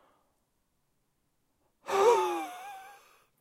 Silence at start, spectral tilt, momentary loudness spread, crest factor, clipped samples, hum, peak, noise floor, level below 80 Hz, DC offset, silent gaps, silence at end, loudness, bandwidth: 1.85 s; -2.5 dB/octave; 24 LU; 22 dB; under 0.1%; none; -12 dBFS; -77 dBFS; -82 dBFS; under 0.1%; none; 0.5 s; -27 LUFS; 16.5 kHz